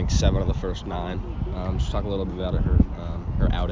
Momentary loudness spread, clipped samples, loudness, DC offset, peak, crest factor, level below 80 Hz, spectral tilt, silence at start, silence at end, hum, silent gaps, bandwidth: 9 LU; under 0.1%; -26 LUFS; under 0.1%; -2 dBFS; 20 dB; -26 dBFS; -6.5 dB/octave; 0 s; 0 s; none; none; 7.6 kHz